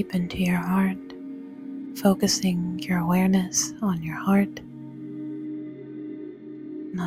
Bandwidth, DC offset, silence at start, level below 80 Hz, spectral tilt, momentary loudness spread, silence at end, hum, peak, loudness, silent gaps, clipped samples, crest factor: 15.5 kHz; under 0.1%; 0 s; -56 dBFS; -5 dB/octave; 17 LU; 0 s; none; -8 dBFS; -25 LUFS; none; under 0.1%; 18 dB